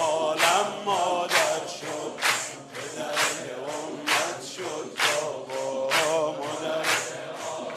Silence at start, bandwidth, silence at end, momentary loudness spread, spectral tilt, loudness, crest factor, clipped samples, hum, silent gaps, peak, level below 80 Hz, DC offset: 0 s; 14.5 kHz; 0 s; 11 LU; -1.5 dB/octave; -26 LUFS; 20 dB; under 0.1%; none; none; -6 dBFS; -76 dBFS; under 0.1%